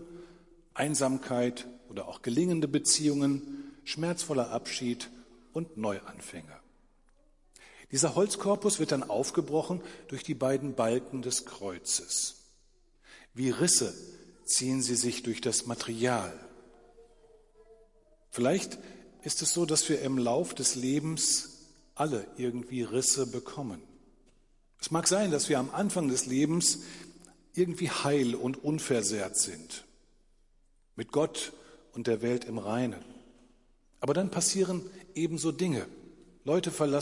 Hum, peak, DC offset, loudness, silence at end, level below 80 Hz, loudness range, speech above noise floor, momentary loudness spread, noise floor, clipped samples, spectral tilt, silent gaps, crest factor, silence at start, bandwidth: none; -12 dBFS; under 0.1%; -30 LUFS; 0 s; -64 dBFS; 6 LU; 35 dB; 16 LU; -65 dBFS; under 0.1%; -3.5 dB/octave; none; 20 dB; 0 s; 11.5 kHz